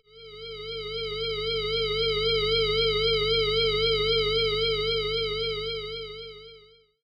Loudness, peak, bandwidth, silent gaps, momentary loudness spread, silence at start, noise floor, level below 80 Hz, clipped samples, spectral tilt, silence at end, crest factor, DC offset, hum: -25 LUFS; -14 dBFS; 9 kHz; none; 15 LU; 0.15 s; -55 dBFS; -44 dBFS; under 0.1%; -4.5 dB/octave; 0.45 s; 14 dB; under 0.1%; 50 Hz at -40 dBFS